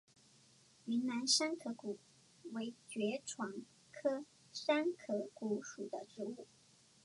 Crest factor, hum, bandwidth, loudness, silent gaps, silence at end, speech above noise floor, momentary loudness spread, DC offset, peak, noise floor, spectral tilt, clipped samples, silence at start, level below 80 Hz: 22 dB; none; 11.5 kHz; -40 LUFS; none; 0.6 s; 28 dB; 18 LU; under 0.1%; -20 dBFS; -67 dBFS; -2.5 dB/octave; under 0.1%; 0.85 s; -90 dBFS